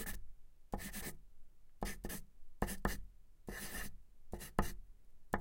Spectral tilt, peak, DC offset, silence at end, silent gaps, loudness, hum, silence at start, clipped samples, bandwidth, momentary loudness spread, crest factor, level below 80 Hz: -4 dB/octave; -14 dBFS; under 0.1%; 0 s; none; -46 LUFS; none; 0 s; under 0.1%; 16.5 kHz; 15 LU; 30 dB; -50 dBFS